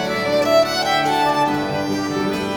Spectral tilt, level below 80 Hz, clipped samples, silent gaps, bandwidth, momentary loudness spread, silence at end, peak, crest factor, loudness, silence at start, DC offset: -4.5 dB/octave; -50 dBFS; under 0.1%; none; over 20 kHz; 6 LU; 0 s; -4 dBFS; 14 dB; -18 LUFS; 0 s; under 0.1%